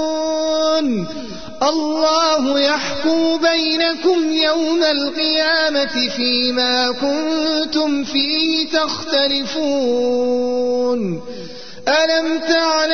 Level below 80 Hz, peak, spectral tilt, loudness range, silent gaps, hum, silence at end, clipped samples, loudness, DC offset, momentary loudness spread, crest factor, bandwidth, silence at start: -52 dBFS; -4 dBFS; -3 dB/octave; 2 LU; none; none; 0 s; under 0.1%; -17 LUFS; 2%; 5 LU; 14 dB; 6.6 kHz; 0 s